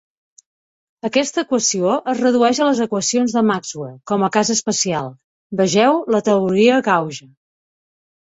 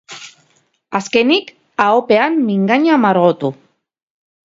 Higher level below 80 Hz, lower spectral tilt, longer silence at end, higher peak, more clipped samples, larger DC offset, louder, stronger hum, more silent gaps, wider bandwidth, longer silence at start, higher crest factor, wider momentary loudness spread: about the same, -62 dBFS vs -64 dBFS; second, -4 dB/octave vs -5.5 dB/octave; about the same, 1.1 s vs 1.05 s; about the same, -2 dBFS vs 0 dBFS; neither; neither; second, -17 LUFS vs -14 LUFS; neither; first, 5.24-5.50 s vs none; about the same, 8.2 kHz vs 7.8 kHz; first, 1.05 s vs 0.1 s; about the same, 16 dB vs 16 dB; about the same, 13 LU vs 12 LU